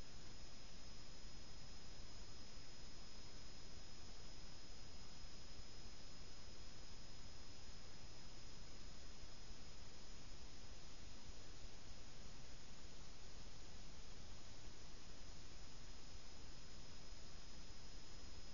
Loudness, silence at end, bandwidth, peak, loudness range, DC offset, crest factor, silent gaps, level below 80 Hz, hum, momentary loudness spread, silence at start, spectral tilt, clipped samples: -59 LUFS; 0 s; 7.2 kHz; -38 dBFS; 1 LU; 0.5%; 14 dB; none; -60 dBFS; none; 1 LU; 0 s; -3.5 dB/octave; under 0.1%